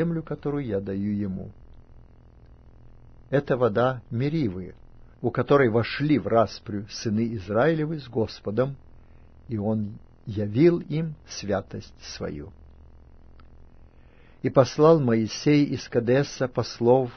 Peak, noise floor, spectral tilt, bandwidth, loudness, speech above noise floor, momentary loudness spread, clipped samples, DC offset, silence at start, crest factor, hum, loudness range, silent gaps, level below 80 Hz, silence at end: -4 dBFS; -51 dBFS; -7 dB/octave; 6.6 kHz; -25 LUFS; 27 dB; 15 LU; under 0.1%; under 0.1%; 0 s; 22 dB; none; 8 LU; none; -50 dBFS; 0 s